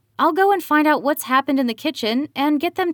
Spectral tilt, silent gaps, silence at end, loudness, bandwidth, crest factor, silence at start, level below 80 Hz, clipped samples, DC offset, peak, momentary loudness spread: -3.5 dB/octave; none; 0 s; -19 LUFS; over 20 kHz; 14 dB; 0.2 s; -74 dBFS; under 0.1%; under 0.1%; -4 dBFS; 6 LU